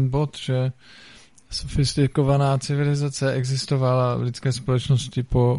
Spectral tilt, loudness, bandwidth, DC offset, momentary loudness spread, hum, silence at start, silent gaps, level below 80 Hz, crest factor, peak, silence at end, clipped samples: -6.5 dB/octave; -23 LUFS; 11.5 kHz; 0.2%; 6 LU; none; 0 s; none; -40 dBFS; 14 dB; -6 dBFS; 0 s; under 0.1%